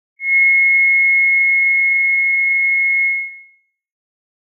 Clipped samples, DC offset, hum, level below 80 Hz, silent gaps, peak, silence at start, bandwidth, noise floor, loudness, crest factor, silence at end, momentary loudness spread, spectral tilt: under 0.1%; under 0.1%; none; under -90 dBFS; none; -6 dBFS; 0.2 s; 2.4 kHz; -53 dBFS; -11 LUFS; 8 dB; 1.2 s; 6 LU; 9 dB/octave